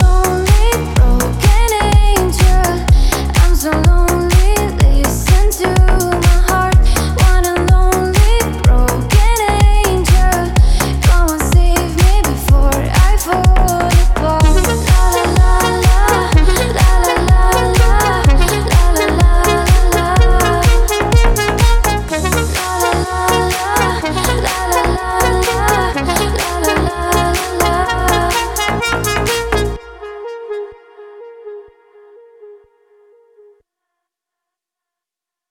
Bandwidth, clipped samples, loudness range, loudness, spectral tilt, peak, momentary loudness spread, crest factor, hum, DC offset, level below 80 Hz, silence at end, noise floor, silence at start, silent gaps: 17 kHz; under 0.1%; 4 LU; -13 LUFS; -5 dB/octave; 0 dBFS; 4 LU; 12 dB; none; under 0.1%; -14 dBFS; 3.05 s; -86 dBFS; 0 s; none